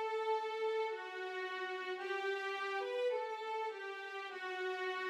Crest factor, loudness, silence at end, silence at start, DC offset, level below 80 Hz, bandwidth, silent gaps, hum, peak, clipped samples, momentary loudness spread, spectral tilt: 12 dB; -40 LUFS; 0 s; 0 s; under 0.1%; under -90 dBFS; 13 kHz; none; none; -28 dBFS; under 0.1%; 6 LU; -0.5 dB/octave